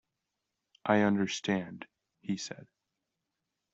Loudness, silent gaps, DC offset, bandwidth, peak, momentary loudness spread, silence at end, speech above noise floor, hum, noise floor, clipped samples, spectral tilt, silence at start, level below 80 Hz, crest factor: -32 LUFS; none; under 0.1%; 8 kHz; -10 dBFS; 22 LU; 1.1 s; 55 dB; none; -86 dBFS; under 0.1%; -5 dB/octave; 0.85 s; -72 dBFS; 24 dB